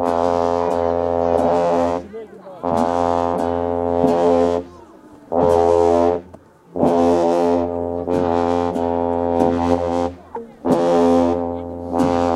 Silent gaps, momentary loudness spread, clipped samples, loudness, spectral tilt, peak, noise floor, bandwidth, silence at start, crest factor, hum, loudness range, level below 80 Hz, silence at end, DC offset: none; 11 LU; under 0.1%; -18 LUFS; -7 dB/octave; -2 dBFS; -44 dBFS; 12 kHz; 0 s; 16 dB; none; 2 LU; -44 dBFS; 0 s; under 0.1%